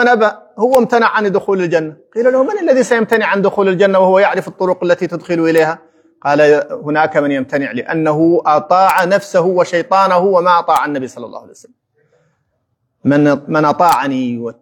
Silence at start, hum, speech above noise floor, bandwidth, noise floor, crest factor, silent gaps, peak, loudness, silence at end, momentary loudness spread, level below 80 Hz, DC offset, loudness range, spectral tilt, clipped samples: 0 s; none; 54 dB; 19 kHz; -67 dBFS; 14 dB; none; 0 dBFS; -13 LUFS; 0.1 s; 8 LU; -64 dBFS; under 0.1%; 4 LU; -6 dB/octave; under 0.1%